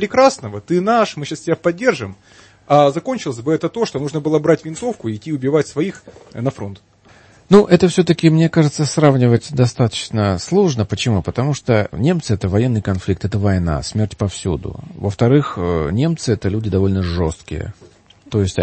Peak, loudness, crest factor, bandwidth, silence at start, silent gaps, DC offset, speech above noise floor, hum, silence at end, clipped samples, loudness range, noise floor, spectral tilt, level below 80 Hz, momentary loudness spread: 0 dBFS; -17 LUFS; 16 dB; 8.8 kHz; 0 s; none; under 0.1%; 31 dB; none; 0 s; under 0.1%; 5 LU; -47 dBFS; -6.5 dB/octave; -40 dBFS; 11 LU